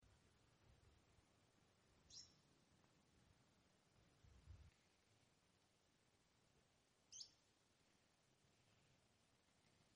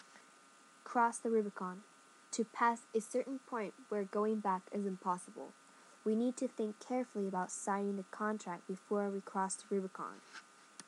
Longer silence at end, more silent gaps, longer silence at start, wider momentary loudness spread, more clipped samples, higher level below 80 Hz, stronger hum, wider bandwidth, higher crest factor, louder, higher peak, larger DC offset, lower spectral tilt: about the same, 0 s vs 0.05 s; neither; about the same, 0 s vs 0.1 s; second, 9 LU vs 14 LU; neither; first, -82 dBFS vs under -90 dBFS; neither; second, 10 kHz vs 12 kHz; first, 28 dB vs 20 dB; second, -63 LUFS vs -39 LUFS; second, -44 dBFS vs -20 dBFS; neither; second, -2 dB/octave vs -5 dB/octave